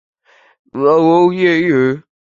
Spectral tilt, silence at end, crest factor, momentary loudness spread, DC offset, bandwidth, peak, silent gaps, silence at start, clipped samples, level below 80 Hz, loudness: -7.5 dB/octave; 0.35 s; 14 dB; 12 LU; under 0.1%; 7.2 kHz; 0 dBFS; none; 0.75 s; under 0.1%; -58 dBFS; -13 LUFS